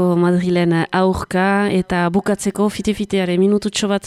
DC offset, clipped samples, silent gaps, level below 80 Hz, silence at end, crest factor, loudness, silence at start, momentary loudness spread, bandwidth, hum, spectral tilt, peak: under 0.1%; under 0.1%; none; -44 dBFS; 0 s; 12 dB; -17 LUFS; 0 s; 4 LU; 13 kHz; none; -6 dB/octave; -4 dBFS